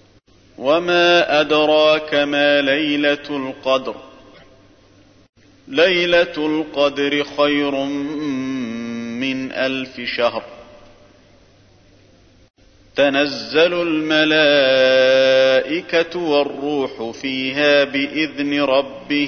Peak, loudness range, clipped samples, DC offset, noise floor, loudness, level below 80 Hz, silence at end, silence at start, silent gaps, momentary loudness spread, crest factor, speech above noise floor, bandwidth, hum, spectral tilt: -2 dBFS; 10 LU; under 0.1%; under 0.1%; -51 dBFS; -17 LUFS; -56 dBFS; 0 s; 0.6 s; 5.29-5.33 s; 11 LU; 16 dB; 34 dB; 6.6 kHz; none; -4.5 dB/octave